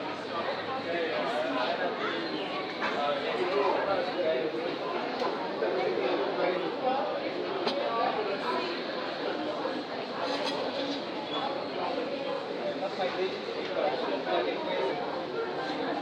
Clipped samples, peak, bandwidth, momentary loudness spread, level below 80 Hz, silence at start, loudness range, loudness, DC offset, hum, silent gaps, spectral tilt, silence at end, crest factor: under 0.1%; -14 dBFS; 11 kHz; 4 LU; -78 dBFS; 0 s; 3 LU; -31 LUFS; under 0.1%; none; none; -5 dB/octave; 0 s; 16 dB